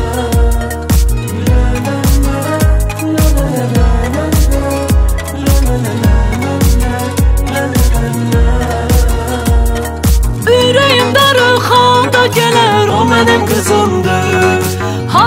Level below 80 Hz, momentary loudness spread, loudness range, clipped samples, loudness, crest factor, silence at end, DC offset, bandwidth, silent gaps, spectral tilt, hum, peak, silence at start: -14 dBFS; 7 LU; 4 LU; under 0.1%; -11 LUFS; 10 dB; 0 s; under 0.1%; 16.5 kHz; none; -5 dB/octave; none; 0 dBFS; 0 s